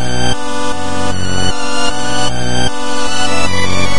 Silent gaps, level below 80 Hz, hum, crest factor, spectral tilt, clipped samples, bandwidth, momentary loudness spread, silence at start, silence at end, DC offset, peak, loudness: none; -30 dBFS; none; 14 dB; -3.5 dB/octave; under 0.1%; 11.5 kHz; 4 LU; 0 s; 0 s; 40%; 0 dBFS; -17 LUFS